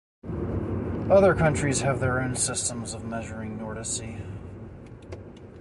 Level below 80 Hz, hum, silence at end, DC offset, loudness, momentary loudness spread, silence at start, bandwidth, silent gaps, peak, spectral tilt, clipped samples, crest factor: -42 dBFS; none; 0 s; under 0.1%; -26 LUFS; 22 LU; 0.25 s; 11.5 kHz; none; -8 dBFS; -5 dB/octave; under 0.1%; 20 dB